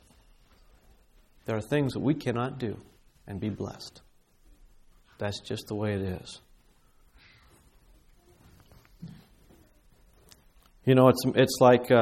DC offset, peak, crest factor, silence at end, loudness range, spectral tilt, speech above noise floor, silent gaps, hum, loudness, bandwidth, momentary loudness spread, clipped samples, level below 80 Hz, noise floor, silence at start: under 0.1%; -6 dBFS; 24 dB; 0 s; 12 LU; -6 dB/octave; 35 dB; none; 60 Hz at -60 dBFS; -27 LUFS; 15.5 kHz; 25 LU; under 0.1%; -58 dBFS; -61 dBFS; 1.5 s